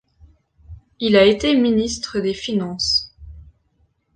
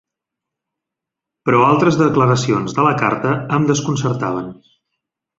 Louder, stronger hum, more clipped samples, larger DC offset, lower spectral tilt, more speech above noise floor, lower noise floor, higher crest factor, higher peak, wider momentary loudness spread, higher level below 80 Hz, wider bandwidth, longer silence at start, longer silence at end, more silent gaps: about the same, -18 LUFS vs -16 LUFS; neither; neither; neither; second, -4.5 dB/octave vs -6 dB/octave; second, 46 dB vs 68 dB; second, -63 dBFS vs -83 dBFS; about the same, 18 dB vs 16 dB; about the same, -2 dBFS vs -2 dBFS; about the same, 10 LU vs 9 LU; first, -44 dBFS vs -52 dBFS; first, 9.4 kHz vs 7.8 kHz; second, 0.7 s vs 1.45 s; about the same, 0.75 s vs 0.85 s; neither